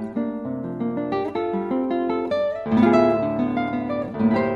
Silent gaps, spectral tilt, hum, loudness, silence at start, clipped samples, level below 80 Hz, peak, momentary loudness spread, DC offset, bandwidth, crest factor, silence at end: none; -8.5 dB/octave; none; -23 LUFS; 0 s; under 0.1%; -52 dBFS; -6 dBFS; 10 LU; under 0.1%; 7 kHz; 16 dB; 0 s